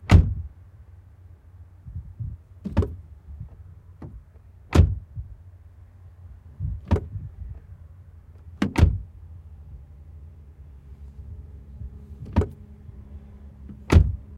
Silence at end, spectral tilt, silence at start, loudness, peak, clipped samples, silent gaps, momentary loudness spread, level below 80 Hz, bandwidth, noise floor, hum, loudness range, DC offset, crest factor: 0 s; -7.5 dB/octave; 0.05 s; -25 LUFS; -4 dBFS; under 0.1%; none; 27 LU; -32 dBFS; 10.5 kHz; -49 dBFS; none; 7 LU; under 0.1%; 24 dB